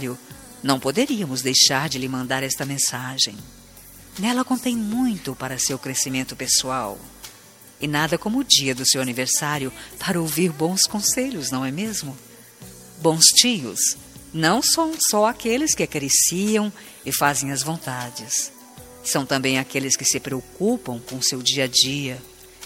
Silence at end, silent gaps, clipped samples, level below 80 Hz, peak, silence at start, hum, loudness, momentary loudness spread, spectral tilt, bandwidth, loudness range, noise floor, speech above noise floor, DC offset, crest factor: 0 s; none; under 0.1%; -56 dBFS; 0 dBFS; 0 s; none; -20 LUFS; 14 LU; -2.5 dB/octave; 16.5 kHz; 6 LU; -47 dBFS; 25 dB; under 0.1%; 22 dB